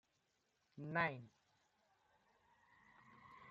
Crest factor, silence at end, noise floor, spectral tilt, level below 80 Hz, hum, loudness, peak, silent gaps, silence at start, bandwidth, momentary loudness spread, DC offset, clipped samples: 26 dB; 0 s; -84 dBFS; -4 dB/octave; -86 dBFS; none; -42 LUFS; -24 dBFS; none; 0.75 s; 7.4 kHz; 25 LU; under 0.1%; under 0.1%